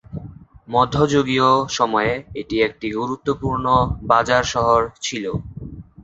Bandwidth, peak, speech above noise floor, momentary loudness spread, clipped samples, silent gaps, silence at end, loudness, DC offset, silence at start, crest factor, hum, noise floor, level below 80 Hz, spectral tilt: 8 kHz; -2 dBFS; 21 dB; 12 LU; under 0.1%; none; 0 s; -19 LUFS; under 0.1%; 0.1 s; 18 dB; none; -40 dBFS; -40 dBFS; -5 dB/octave